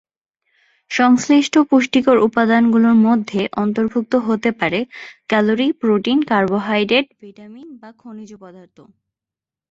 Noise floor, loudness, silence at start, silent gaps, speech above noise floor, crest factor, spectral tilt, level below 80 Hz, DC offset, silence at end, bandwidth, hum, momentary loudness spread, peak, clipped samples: -88 dBFS; -16 LUFS; 0.9 s; none; 72 dB; 16 dB; -5 dB/octave; -60 dBFS; under 0.1%; 1.2 s; 7.8 kHz; none; 12 LU; -2 dBFS; under 0.1%